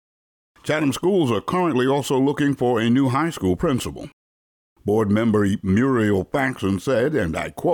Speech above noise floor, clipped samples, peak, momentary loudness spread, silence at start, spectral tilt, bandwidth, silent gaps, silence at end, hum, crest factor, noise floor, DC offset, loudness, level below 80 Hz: over 70 dB; under 0.1%; -10 dBFS; 7 LU; 0.65 s; -6.5 dB/octave; 19 kHz; 4.13-4.76 s; 0 s; none; 10 dB; under -90 dBFS; under 0.1%; -21 LUFS; -48 dBFS